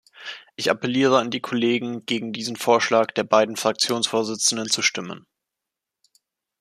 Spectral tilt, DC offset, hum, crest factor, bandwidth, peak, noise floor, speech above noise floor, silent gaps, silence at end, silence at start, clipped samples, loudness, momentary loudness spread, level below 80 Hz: -3 dB/octave; under 0.1%; none; 20 dB; 15 kHz; -2 dBFS; -85 dBFS; 64 dB; none; 1.4 s; 0.2 s; under 0.1%; -21 LUFS; 13 LU; -72 dBFS